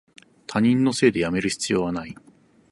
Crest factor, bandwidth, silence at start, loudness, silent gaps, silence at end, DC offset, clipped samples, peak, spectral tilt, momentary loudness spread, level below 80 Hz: 18 dB; 11.5 kHz; 0.5 s; -22 LUFS; none; 0.6 s; under 0.1%; under 0.1%; -4 dBFS; -5 dB/octave; 14 LU; -54 dBFS